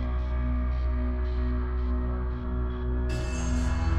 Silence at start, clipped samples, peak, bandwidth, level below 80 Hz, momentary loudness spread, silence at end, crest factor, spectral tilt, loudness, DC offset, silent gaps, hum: 0 s; under 0.1%; -14 dBFS; 8.6 kHz; -28 dBFS; 3 LU; 0 s; 12 dB; -7 dB/octave; -30 LUFS; under 0.1%; none; none